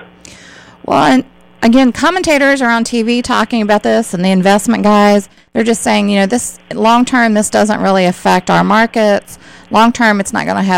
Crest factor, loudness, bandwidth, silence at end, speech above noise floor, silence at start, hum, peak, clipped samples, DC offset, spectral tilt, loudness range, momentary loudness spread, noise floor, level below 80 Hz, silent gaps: 12 dB; -11 LUFS; 16 kHz; 0 s; 27 dB; 0 s; none; 0 dBFS; under 0.1%; under 0.1%; -4.5 dB/octave; 1 LU; 6 LU; -38 dBFS; -44 dBFS; none